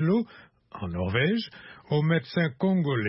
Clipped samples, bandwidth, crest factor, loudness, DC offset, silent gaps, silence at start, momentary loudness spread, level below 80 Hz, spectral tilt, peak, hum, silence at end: under 0.1%; 5.8 kHz; 16 dB; -27 LUFS; under 0.1%; none; 0 s; 14 LU; -58 dBFS; -11 dB/octave; -12 dBFS; none; 0 s